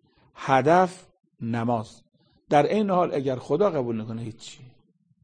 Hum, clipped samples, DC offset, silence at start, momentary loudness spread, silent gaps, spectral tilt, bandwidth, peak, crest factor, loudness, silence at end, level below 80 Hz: none; under 0.1%; under 0.1%; 0.4 s; 17 LU; none; -7 dB/octave; 9.8 kHz; -6 dBFS; 20 dB; -24 LUFS; 0.6 s; -62 dBFS